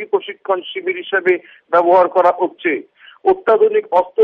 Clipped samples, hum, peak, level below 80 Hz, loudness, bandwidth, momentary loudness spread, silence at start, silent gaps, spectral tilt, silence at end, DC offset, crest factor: under 0.1%; none; -2 dBFS; -62 dBFS; -16 LUFS; 5.6 kHz; 9 LU; 0 s; none; -6.5 dB/octave; 0 s; under 0.1%; 14 dB